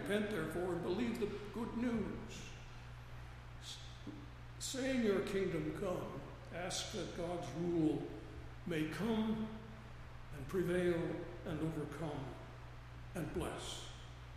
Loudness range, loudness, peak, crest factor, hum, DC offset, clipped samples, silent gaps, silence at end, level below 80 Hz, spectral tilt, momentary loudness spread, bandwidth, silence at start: 5 LU; -41 LUFS; -24 dBFS; 18 dB; none; under 0.1%; under 0.1%; none; 0 s; -56 dBFS; -5.5 dB/octave; 17 LU; 15 kHz; 0 s